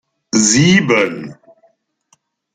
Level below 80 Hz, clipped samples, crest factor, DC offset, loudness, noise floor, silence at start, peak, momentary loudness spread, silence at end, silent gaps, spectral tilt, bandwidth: -52 dBFS; under 0.1%; 16 dB; under 0.1%; -12 LUFS; -59 dBFS; 0.35 s; 0 dBFS; 17 LU; 1.2 s; none; -3.5 dB/octave; 9.6 kHz